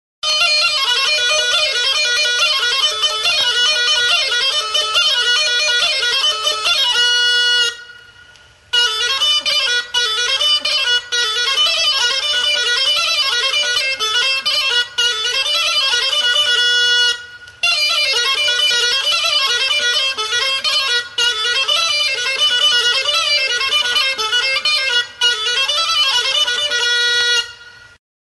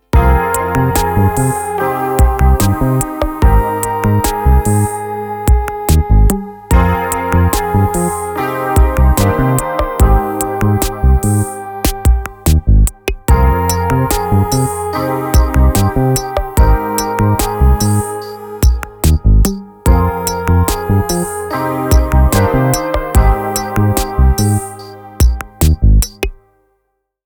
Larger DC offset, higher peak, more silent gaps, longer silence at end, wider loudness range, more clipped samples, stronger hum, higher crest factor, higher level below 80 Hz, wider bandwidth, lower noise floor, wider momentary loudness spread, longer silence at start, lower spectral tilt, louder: neither; second, -4 dBFS vs 0 dBFS; neither; second, 0.6 s vs 0.95 s; about the same, 1 LU vs 1 LU; neither; neither; about the same, 12 dB vs 12 dB; second, -56 dBFS vs -16 dBFS; second, 12 kHz vs over 20 kHz; second, -46 dBFS vs -67 dBFS; second, 3 LU vs 6 LU; about the same, 0.25 s vs 0.15 s; second, 3 dB/octave vs -6 dB/octave; about the same, -13 LUFS vs -14 LUFS